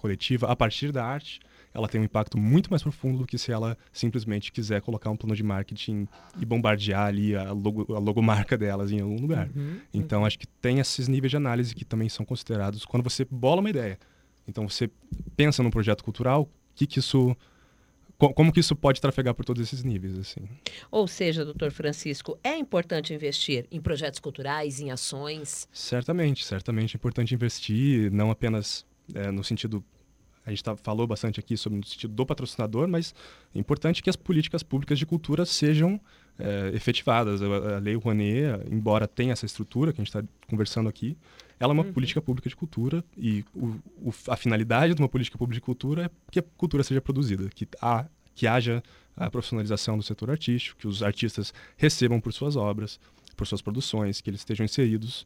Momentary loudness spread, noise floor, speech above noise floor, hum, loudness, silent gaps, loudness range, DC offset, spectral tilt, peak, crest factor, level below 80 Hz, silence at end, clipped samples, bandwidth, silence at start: 10 LU; -61 dBFS; 34 dB; none; -27 LUFS; none; 4 LU; under 0.1%; -6 dB/octave; -6 dBFS; 22 dB; -50 dBFS; 0 s; under 0.1%; 16 kHz; 0.05 s